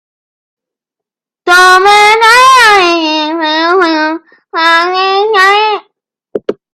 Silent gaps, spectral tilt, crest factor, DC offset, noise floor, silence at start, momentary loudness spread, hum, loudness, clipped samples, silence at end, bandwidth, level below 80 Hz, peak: none; -1 dB/octave; 8 dB; under 0.1%; -82 dBFS; 1.45 s; 16 LU; none; -6 LUFS; 0.3%; 0.2 s; 16 kHz; -50 dBFS; 0 dBFS